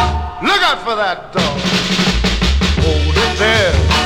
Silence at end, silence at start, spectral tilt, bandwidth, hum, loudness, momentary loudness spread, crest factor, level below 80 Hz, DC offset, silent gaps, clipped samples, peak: 0 s; 0 s; -4.5 dB/octave; 14.5 kHz; none; -14 LUFS; 5 LU; 12 dB; -20 dBFS; under 0.1%; none; under 0.1%; -2 dBFS